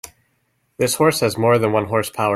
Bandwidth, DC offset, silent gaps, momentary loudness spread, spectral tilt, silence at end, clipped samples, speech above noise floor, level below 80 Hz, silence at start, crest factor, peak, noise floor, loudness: 16 kHz; under 0.1%; none; 5 LU; -4.5 dB/octave; 0 s; under 0.1%; 49 dB; -56 dBFS; 0.8 s; 16 dB; -4 dBFS; -66 dBFS; -18 LUFS